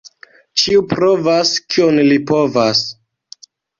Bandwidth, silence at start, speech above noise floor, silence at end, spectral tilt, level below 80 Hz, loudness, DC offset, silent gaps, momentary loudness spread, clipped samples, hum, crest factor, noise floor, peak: 7.6 kHz; 0.05 s; 30 dB; 0.9 s; -4 dB/octave; -52 dBFS; -14 LUFS; under 0.1%; none; 4 LU; under 0.1%; none; 14 dB; -44 dBFS; -2 dBFS